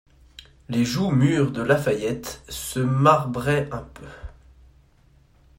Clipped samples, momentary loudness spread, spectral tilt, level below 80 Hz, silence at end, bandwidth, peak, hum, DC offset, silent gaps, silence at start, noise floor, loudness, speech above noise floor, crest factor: under 0.1%; 19 LU; -6 dB/octave; -48 dBFS; 1.25 s; 16.5 kHz; -2 dBFS; none; under 0.1%; none; 0.7 s; -57 dBFS; -22 LUFS; 35 dB; 22 dB